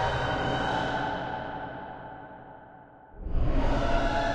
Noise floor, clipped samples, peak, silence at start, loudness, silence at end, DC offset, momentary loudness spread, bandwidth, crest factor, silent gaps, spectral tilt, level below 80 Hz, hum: -51 dBFS; under 0.1%; -12 dBFS; 0 s; -30 LUFS; 0 s; under 0.1%; 20 LU; 8.2 kHz; 16 dB; none; -6 dB/octave; -34 dBFS; none